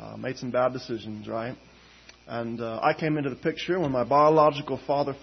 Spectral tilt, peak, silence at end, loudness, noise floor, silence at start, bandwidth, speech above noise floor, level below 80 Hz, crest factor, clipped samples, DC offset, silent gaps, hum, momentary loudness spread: -7 dB/octave; -8 dBFS; 0.05 s; -26 LUFS; -53 dBFS; 0 s; 6.4 kHz; 27 dB; -60 dBFS; 18 dB; under 0.1%; under 0.1%; none; none; 15 LU